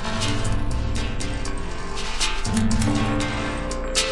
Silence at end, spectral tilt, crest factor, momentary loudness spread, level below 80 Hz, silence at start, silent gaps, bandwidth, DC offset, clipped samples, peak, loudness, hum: 0 s; -4 dB/octave; 14 dB; 8 LU; -28 dBFS; 0 s; none; 11.5 kHz; under 0.1%; under 0.1%; -8 dBFS; -25 LUFS; none